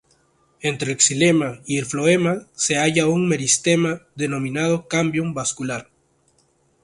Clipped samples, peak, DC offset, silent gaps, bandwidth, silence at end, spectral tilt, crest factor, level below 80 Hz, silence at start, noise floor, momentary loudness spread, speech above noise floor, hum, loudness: under 0.1%; 0 dBFS; under 0.1%; none; 11.5 kHz; 1 s; -4 dB/octave; 20 dB; -58 dBFS; 0.65 s; -62 dBFS; 9 LU; 42 dB; none; -20 LUFS